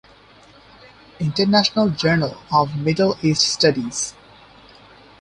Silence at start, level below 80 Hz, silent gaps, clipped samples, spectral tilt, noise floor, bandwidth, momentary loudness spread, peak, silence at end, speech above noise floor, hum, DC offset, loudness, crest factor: 1.2 s; -52 dBFS; none; under 0.1%; -4.5 dB/octave; -48 dBFS; 11 kHz; 9 LU; -2 dBFS; 1.1 s; 30 dB; none; under 0.1%; -19 LUFS; 18 dB